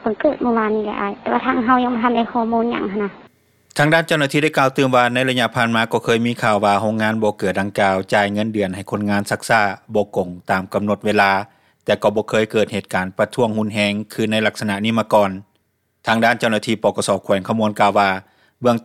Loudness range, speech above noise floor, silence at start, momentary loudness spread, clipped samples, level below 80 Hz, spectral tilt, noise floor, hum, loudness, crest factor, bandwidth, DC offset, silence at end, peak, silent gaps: 3 LU; 48 dB; 0 s; 7 LU; under 0.1%; -56 dBFS; -5 dB/octave; -66 dBFS; none; -18 LUFS; 16 dB; 15.5 kHz; under 0.1%; 0 s; -2 dBFS; none